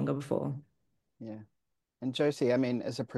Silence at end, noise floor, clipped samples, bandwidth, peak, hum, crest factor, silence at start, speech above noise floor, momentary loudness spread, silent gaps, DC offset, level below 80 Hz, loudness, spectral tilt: 0 s; -80 dBFS; under 0.1%; 12.5 kHz; -16 dBFS; none; 18 dB; 0 s; 48 dB; 17 LU; none; under 0.1%; -74 dBFS; -32 LUFS; -6.5 dB/octave